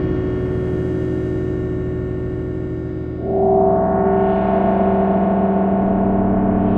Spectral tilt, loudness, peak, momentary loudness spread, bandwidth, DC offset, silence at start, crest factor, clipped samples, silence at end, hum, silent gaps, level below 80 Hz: -11 dB/octave; -18 LUFS; -4 dBFS; 8 LU; 4 kHz; under 0.1%; 0 s; 14 dB; under 0.1%; 0 s; none; none; -32 dBFS